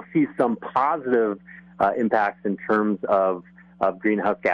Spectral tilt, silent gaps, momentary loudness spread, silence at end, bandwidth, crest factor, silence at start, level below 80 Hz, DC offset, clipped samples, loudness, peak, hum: -8.5 dB/octave; none; 5 LU; 0 s; 10.5 kHz; 16 dB; 0 s; -64 dBFS; under 0.1%; under 0.1%; -23 LUFS; -8 dBFS; none